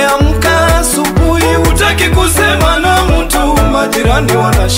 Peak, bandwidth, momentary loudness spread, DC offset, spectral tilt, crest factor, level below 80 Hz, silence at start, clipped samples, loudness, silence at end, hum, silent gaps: 0 dBFS; 16.5 kHz; 2 LU; under 0.1%; -4.5 dB/octave; 10 dB; -16 dBFS; 0 s; under 0.1%; -10 LUFS; 0 s; none; none